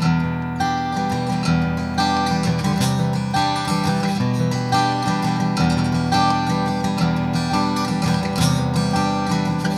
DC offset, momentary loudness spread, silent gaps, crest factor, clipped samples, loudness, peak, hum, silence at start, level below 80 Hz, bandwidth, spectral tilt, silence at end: under 0.1%; 3 LU; none; 14 dB; under 0.1%; -20 LUFS; -6 dBFS; none; 0 s; -40 dBFS; 13.5 kHz; -5.5 dB/octave; 0 s